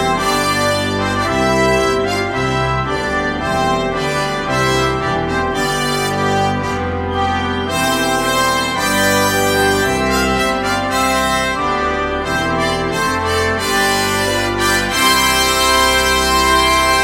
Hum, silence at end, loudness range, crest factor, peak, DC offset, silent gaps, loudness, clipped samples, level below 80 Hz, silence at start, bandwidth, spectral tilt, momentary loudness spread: none; 0 s; 4 LU; 14 dB; -2 dBFS; under 0.1%; none; -15 LUFS; under 0.1%; -32 dBFS; 0 s; 17 kHz; -3.5 dB/octave; 6 LU